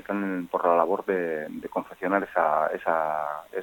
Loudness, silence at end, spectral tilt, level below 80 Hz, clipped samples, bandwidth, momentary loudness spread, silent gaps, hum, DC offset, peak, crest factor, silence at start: -26 LUFS; 0 s; -7.5 dB/octave; -68 dBFS; under 0.1%; 17 kHz; 9 LU; none; none; under 0.1%; -6 dBFS; 20 dB; 0.1 s